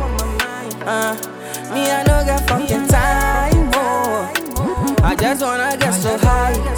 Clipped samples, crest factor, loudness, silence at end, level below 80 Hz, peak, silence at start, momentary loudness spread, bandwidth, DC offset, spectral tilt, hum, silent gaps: under 0.1%; 14 dB; -17 LUFS; 0 s; -22 dBFS; -2 dBFS; 0 s; 7 LU; over 20 kHz; under 0.1%; -4.5 dB/octave; none; none